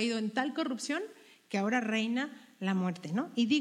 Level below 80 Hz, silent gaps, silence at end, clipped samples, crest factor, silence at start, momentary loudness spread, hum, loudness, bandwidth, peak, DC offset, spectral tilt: -88 dBFS; none; 0 s; under 0.1%; 18 dB; 0 s; 7 LU; none; -33 LUFS; 12.5 kHz; -16 dBFS; under 0.1%; -5 dB/octave